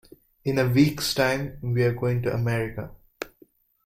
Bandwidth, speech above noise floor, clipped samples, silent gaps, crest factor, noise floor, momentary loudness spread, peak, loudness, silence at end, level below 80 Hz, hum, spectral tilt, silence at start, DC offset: 16 kHz; 35 dB; under 0.1%; none; 18 dB; -59 dBFS; 18 LU; -6 dBFS; -24 LUFS; 0.6 s; -50 dBFS; none; -6 dB/octave; 0.45 s; under 0.1%